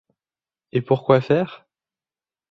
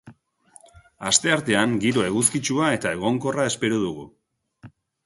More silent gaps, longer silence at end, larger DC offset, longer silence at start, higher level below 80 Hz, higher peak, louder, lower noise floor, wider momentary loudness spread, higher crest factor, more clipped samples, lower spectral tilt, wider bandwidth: neither; first, 0.95 s vs 0.4 s; neither; first, 0.75 s vs 0.05 s; about the same, -60 dBFS vs -58 dBFS; about the same, -2 dBFS vs -2 dBFS; about the same, -20 LUFS vs -22 LUFS; first, under -90 dBFS vs -55 dBFS; first, 10 LU vs 6 LU; about the same, 22 dB vs 22 dB; neither; first, -9 dB/octave vs -3.5 dB/octave; second, 7 kHz vs 12 kHz